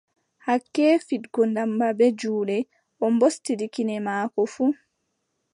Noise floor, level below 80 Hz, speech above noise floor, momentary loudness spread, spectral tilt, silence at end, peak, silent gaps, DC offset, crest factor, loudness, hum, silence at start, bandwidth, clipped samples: -76 dBFS; -80 dBFS; 53 dB; 8 LU; -5.5 dB/octave; 0.8 s; -8 dBFS; none; under 0.1%; 16 dB; -24 LUFS; none; 0.45 s; 11.5 kHz; under 0.1%